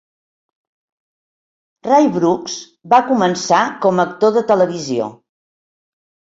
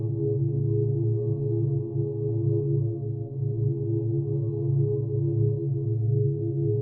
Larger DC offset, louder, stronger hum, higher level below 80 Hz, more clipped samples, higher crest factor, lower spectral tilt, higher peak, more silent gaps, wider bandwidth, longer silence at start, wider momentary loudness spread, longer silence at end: neither; first, -15 LUFS vs -27 LUFS; neither; second, -62 dBFS vs -54 dBFS; neither; about the same, 16 dB vs 12 dB; second, -5 dB/octave vs -16.5 dB/octave; first, -2 dBFS vs -14 dBFS; neither; first, 7.8 kHz vs 1.2 kHz; first, 1.85 s vs 0 s; first, 12 LU vs 3 LU; first, 1.25 s vs 0 s